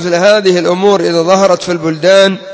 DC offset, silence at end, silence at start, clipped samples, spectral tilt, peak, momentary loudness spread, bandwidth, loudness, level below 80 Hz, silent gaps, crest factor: under 0.1%; 0 s; 0 s; 0.4%; -4.5 dB/octave; 0 dBFS; 5 LU; 8 kHz; -9 LUFS; -56 dBFS; none; 10 dB